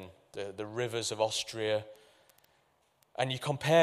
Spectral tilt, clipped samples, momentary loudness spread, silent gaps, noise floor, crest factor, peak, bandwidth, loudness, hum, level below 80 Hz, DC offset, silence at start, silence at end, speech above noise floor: -4 dB/octave; under 0.1%; 13 LU; none; -71 dBFS; 22 dB; -12 dBFS; 15.5 kHz; -34 LUFS; none; -72 dBFS; under 0.1%; 0 s; 0 s; 40 dB